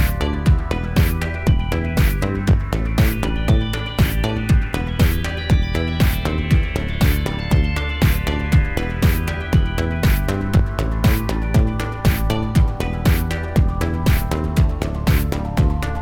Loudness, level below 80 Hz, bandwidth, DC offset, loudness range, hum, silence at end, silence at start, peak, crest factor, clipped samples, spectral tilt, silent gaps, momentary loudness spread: -19 LUFS; -22 dBFS; 17.5 kHz; under 0.1%; 0 LU; none; 0 s; 0 s; -2 dBFS; 16 dB; under 0.1%; -6.5 dB/octave; none; 3 LU